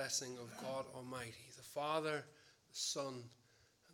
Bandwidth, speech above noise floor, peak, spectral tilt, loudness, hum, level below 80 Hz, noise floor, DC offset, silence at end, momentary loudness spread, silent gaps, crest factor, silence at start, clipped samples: 17.5 kHz; 27 dB; -24 dBFS; -2.5 dB/octave; -44 LUFS; none; -84 dBFS; -72 dBFS; under 0.1%; 0 s; 14 LU; none; 22 dB; 0 s; under 0.1%